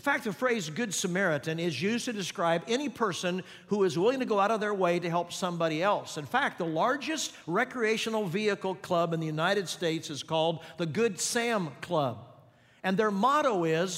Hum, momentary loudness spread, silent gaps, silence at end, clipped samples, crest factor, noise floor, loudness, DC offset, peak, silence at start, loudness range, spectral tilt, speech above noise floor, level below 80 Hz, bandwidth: none; 6 LU; none; 0 s; under 0.1%; 18 dB; -59 dBFS; -29 LUFS; under 0.1%; -12 dBFS; 0.05 s; 2 LU; -4 dB/octave; 29 dB; -76 dBFS; 16 kHz